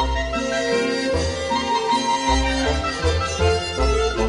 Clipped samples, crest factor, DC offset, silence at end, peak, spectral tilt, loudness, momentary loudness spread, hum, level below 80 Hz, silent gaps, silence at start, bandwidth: under 0.1%; 14 dB; under 0.1%; 0 s; -6 dBFS; -4.5 dB/octave; -21 LUFS; 3 LU; none; -28 dBFS; none; 0 s; 11 kHz